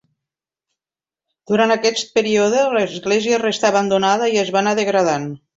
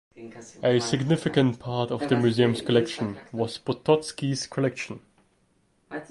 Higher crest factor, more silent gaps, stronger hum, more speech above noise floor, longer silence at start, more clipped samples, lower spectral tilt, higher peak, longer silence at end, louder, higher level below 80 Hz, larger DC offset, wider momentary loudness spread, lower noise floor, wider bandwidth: about the same, 16 dB vs 20 dB; neither; neither; first, over 73 dB vs 42 dB; first, 1.5 s vs 0.2 s; neither; second, -4 dB/octave vs -6 dB/octave; first, -2 dBFS vs -6 dBFS; first, 0.2 s vs 0.05 s; first, -17 LUFS vs -25 LUFS; about the same, -62 dBFS vs -60 dBFS; neither; second, 3 LU vs 17 LU; first, under -90 dBFS vs -67 dBFS; second, 8 kHz vs 11.5 kHz